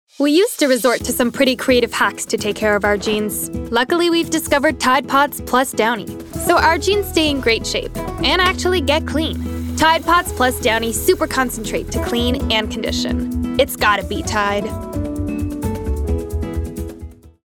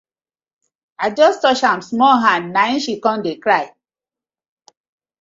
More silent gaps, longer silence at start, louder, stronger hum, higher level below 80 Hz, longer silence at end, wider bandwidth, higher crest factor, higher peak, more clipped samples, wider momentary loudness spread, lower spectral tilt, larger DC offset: neither; second, 0.2 s vs 1 s; about the same, -17 LUFS vs -16 LUFS; neither; first, -32 dBFS vs -66 dBFS; second, 0.2 s vs 1.55 s; first, 19.5 kHz vs 7.8 kHz; about the same, 14 dB vs 18 dB; about the same, -2 dBFS vs 0 dBFS; neither; about the same, 9 LU vs 8 LU; about the same, -4 dB/octave vs -4 dB/octave; neither